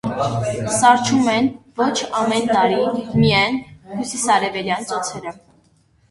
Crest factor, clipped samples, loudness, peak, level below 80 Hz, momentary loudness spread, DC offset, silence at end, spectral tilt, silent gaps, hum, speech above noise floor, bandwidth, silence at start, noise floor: 18 dB; under 0.1%; -18 LUFS; 0 dBFS; -50 dBFS; 12 LU; under 0.1%; 0.8 s; -4 dB/octave; none; none; 39 dB; 11.5 kHz; 0.05 s; -57 dBFS